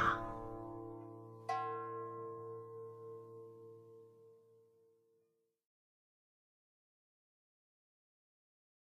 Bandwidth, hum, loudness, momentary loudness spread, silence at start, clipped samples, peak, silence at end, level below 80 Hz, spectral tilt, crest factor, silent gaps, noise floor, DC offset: 14.5 kHz; none; -46 LUFS; 19 LU; 0 s; under 0.1%; -22 dBFS; 4.3 s; -68 dBFS; -6 dB/octave; 26 dB; none; -81 dBFS; under 0.1%